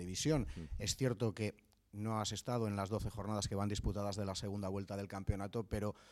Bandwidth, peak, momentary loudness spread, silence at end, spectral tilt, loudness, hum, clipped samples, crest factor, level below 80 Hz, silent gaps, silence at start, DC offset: 15 kHz; -22 dBFS; 7 LU; 0 s; -5 dB/octave; -40 LUFS; none; under 0.1%; 18 dB; -52 dBFS; none; 0 s; under 0.1%